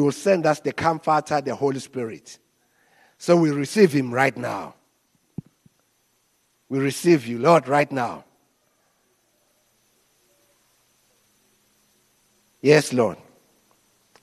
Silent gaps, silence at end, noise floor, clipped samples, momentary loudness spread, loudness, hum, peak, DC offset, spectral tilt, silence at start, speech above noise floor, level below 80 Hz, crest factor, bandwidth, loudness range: none; 1.1 s; -67 dBFS; under 0.1%; 23 LU; -21 LUFS; none; -2 dBFS; under 0.1%; -5.5 dB/octave; 0 s; 46 dB; -68 dBFS; 22 dB; 13 kHz; 4 LU